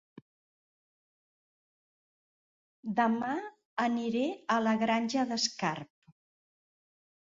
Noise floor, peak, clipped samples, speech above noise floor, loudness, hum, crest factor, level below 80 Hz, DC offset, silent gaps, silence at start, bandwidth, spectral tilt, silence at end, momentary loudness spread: under -90 dBFS; -14 dBFS; under 0.1%; over 60 dB; -31 LUFS; none; 20 dB; -78 dBFS; under 0.1%; 3.65-3.77 s; 2.85 s; 7.8 kHz; -4 dB/octave; 1.35 s; 9 LU